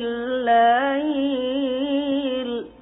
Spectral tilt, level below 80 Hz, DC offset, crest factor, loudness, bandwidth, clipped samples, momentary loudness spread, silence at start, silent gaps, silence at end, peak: 1.5 dB/octave; -58 dBFS; under 0.1%; 14 dB; -21 LUFS; 3.9 kHz; under 0.1%; 9 LU; 0 s; none; 0.1 s; -8 dBFS